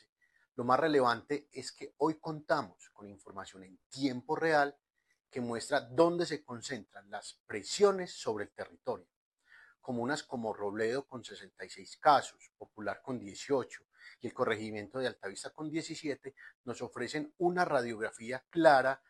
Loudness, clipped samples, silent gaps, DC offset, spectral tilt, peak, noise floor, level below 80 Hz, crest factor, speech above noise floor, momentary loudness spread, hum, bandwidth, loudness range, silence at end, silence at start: -34 LUFS; under 0.1%; 3.86-3.90 s, 7.40-7.45 s, 9.16-9.32 s, 16.55-16.64 s; under 0.1%; -4.5 dB/octave; -10 dBFS; -63 dBFS; -76 dBFS; 24 dB; 29 dB; 19 LU; none; 12.5 kHz; 5 LU; 0.15 s; 0.55 s